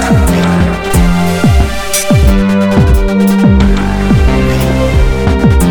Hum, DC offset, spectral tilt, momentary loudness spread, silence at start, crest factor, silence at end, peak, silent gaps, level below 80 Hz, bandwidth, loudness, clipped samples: none; under 0.1%; -6 dB/octave; 3 LU; 0 s; 8 dB; 0 s; 0 dBFS; none; -12 dBFS; 19.5 kHz; -10 LUFS; under 0.1%